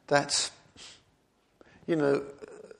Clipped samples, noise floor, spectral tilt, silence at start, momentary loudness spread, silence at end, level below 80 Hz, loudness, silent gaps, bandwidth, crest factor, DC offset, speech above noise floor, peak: under 0.1%; -69 dBFS; -3 dB/octave; 0.1 s; 23 LU; 0.1 s; -70 dBFS; -28 LUFS; none; 11.5 kHz; 26 dB; under 0.1%; 41 dB; -6 dBFS